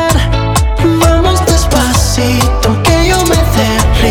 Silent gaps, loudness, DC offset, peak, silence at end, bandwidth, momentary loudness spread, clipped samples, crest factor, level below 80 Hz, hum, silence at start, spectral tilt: none; -10 LUFS; under 0.1%; 0 dBFS; 0 s; 20 kHz; 2 LU; under 0.1%; 8 dB; -14 dBFS; none; 0 s; -4.5 dB/octave